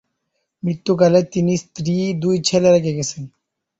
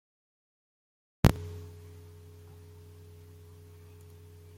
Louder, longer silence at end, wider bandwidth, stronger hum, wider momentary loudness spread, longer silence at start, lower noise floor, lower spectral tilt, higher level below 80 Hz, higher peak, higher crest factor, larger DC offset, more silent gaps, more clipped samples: first, -18 LUFS vs -29 LUFS; first, 0.5 s vs 0.2 s; second, 8.2 kHz vs 16.5 kHz; second, none vs 50 Hz at -60 dBFS; second, 12 LU vs 26 LU; second, 0.65 s vs 1.25 s; first, -74 dBFS vs -52 dBFS; about the same, -5.5 dB/octave vs -6.5 dB/octave; second, -56 dBFS vs -46 dBFS; about the same, -2 dBFS vs -4 dBFS; second, 16 dB vs 32 dB; neither; neither; neither